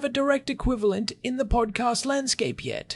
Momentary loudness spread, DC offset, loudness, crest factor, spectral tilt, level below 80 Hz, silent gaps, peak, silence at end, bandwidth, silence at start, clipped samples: 5 LU; under 0.1%; -26 LUFS; 16 dB; -4 dB/octave; -36 dBFS; none; -10 dBFS; 0 s; 12 kHz; 0 s; under 0.1%